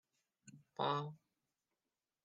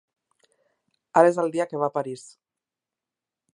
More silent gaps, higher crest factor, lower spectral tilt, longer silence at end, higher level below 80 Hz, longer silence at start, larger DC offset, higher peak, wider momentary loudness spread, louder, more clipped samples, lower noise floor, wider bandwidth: neither; about the same, 22 dB vs 24 dB; about the same, -6 dB/octave vs -6 dB/octave; second, 1.1 s vs 1.35 s; second, under -90 dBFS vs -80 dBFS; second, 0.45 s vs 1.15 s; neither; second, -24 dBFS vs -2 dBFS; first, 24 LU vs 15 LU; second, -41 LUFS vs -23 LUFS; neither; about the same, under -90 dBFS vs -89 dBFS; second, 9.4 kHz vs 11 kHz